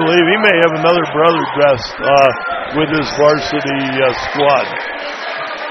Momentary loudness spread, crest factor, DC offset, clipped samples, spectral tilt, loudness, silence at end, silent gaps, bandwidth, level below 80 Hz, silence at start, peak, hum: 11 LU; 14 dB; under 0.1%; under 0.1%; -5 dB/octave; -13 LUFS; 0 s; none; 6.4 kHz; -46 dBFS; 0 s; 0 dBFS; none